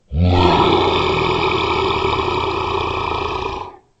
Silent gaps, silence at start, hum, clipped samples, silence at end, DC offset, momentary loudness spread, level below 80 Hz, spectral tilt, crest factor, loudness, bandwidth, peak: none; 0.1 s; none; under 0.1%; 0.25 s; under 0.1%; 10 LU; -34 dBFS; -6.5 dB/octave; 16 dB; -17 LUFS; 8.2 kHz; 0 dBFS